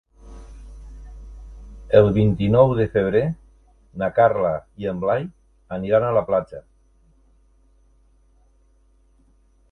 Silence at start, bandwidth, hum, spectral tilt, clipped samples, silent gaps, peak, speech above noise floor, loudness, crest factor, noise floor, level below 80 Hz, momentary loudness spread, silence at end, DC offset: 0.25 s; 6.4 kHz; none; -9.5 dB/octave; under 0.1%; none; 0 dBFS; 39 dB; -20 LUFS; 22 dB; -57 dBFS; -44 dBFS; 26 LU; 3.1 s; under 0.1%